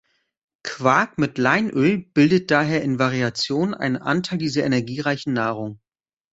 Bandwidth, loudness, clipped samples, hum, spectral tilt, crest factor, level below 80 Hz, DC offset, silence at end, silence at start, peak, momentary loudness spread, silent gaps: 8 kHz; -21 LUFS; under 0.1%; none; -6 dB/octave; 18 dB; -60 dBFS; under 0.1%; 0.55 s; 0.65 s; -2 dBFS; 6 LU; none